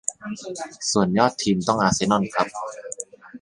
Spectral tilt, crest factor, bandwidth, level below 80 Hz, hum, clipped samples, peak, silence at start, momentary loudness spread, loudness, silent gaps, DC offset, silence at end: -4 dB/octave; 20 dB; 11.5 kHz; -54 dBFS; none; under 0.1%; -2 dBFS; 0.1 s; 14 LU; -22 LUFS; none; under 0.1%; 0.05 s